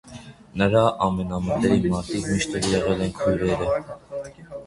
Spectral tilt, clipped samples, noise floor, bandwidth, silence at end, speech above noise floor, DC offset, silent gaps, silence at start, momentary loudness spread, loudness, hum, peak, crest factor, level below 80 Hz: -5.5 dB/octave; under 0.1%; -43 dBFS; 11.5 kHz; 0 s; 20 dB; under 0.1%; none; 0.05 s; 16 LU; -23 LUFS; none; -4 dBFS; 20 dB; -42 dBFS